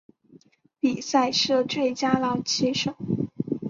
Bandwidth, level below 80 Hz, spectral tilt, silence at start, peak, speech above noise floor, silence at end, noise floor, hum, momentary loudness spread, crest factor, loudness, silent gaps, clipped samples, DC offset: 7.6 kHz; -62 dBFS; -4 dB/octave; 0.85 s; -6 dBFS; 32 dB; 0 s; -56 dBFS; none; 7 LU; 20 dB; -24 LUFS; none; under 0.1%; under 0.1%